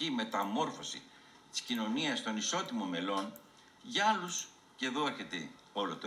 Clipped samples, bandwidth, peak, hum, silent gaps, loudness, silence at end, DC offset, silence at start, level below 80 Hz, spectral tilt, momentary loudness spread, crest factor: under 0.1%; 16 kHz; -18 dBFS; none; none; -36 LUFS; 0 s; under 0.1%; 0 s; -82 dBFS; -2.5 dB/octave; 11 LU; 20 dB